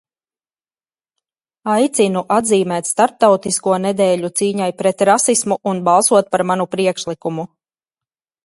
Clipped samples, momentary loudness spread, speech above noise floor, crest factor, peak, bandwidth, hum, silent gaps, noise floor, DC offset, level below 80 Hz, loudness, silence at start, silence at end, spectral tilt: under 0.1%; 10 LU; over 75 dB; 18 dB; 0 dBFS; 12 kHz; none; none; under -90 dBFS; under 0.1%; -62 dBFS; -16 LUFS; 1.65 s; 1 s; -4 dB/octave